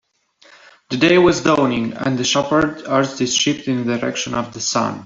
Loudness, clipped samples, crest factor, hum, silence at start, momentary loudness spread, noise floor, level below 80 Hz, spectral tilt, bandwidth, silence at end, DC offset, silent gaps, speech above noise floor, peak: -17 LUFS; under 0.1%; 16 dB; none; 0.9 s; 8 LU; -53 dBFS; -52 dBFS; -4 dB/octave; 7.8 kHz; 0 s; under 0.1%; none; 35 dB; -2 dBFS